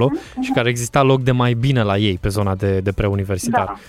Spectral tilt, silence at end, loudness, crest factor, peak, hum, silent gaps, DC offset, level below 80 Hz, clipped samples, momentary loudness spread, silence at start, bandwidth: -6 dB/octave; 0.05 s; -18 LUFS; 14 dB; -2 dBFS; none; none; under 0.1%; -38 dBFS; under 0.1%; 5 LU; 0 s; 14.5 kHz